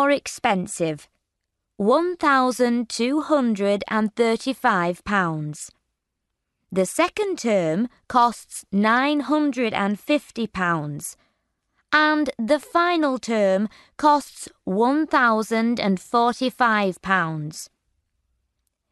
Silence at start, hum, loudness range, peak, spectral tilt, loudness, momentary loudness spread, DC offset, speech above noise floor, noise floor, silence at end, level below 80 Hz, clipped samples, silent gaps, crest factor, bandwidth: 0 s; none; 3 LU; -4 dBFS; -5 dB/octave; -21 LUFS; 11 LU; under 0.1%; 58 dB; -80 dBFS; 1.25 s; -60 dBFS; under 0.1%; none; 18 dB; 12 kHz